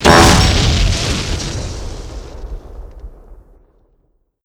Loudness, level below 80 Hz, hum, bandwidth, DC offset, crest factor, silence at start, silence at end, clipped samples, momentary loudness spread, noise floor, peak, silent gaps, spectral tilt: -13 LUFS; -22 dBFS; none; over 20 kHz; under 0.1%; 16 dB; 0 s; 1.1 s; 0.3%; 26 LU; -60 dBFS; 0 dBFS; none; -4 dB/octave